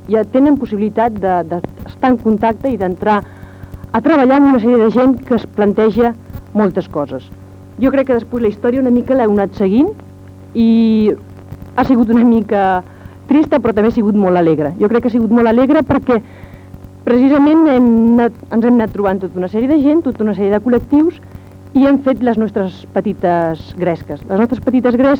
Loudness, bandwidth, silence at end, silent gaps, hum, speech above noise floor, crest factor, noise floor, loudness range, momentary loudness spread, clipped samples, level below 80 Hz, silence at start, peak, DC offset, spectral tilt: -13 LUFS; 16 kHz; 0 s; none; none; 22 dB; 12 dB; -34 dBFS; 4 LU; 10 LU; under 0.1%; -42 dBFS; 0.05 s; 0 dBFS; under 0.1%; -9 dB/octave